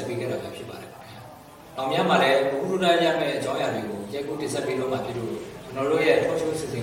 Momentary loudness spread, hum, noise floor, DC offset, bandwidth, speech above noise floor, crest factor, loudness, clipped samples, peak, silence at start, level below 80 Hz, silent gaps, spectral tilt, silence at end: 19 LU; none; -45 dBFS; under 0.1%; 16.5 kHz; 21 dB; 18 dB; -24 LUFS; under 0.1%; -6 dBFS; 0 s; -60 dBFS; none; -5 dB/octave; 0 s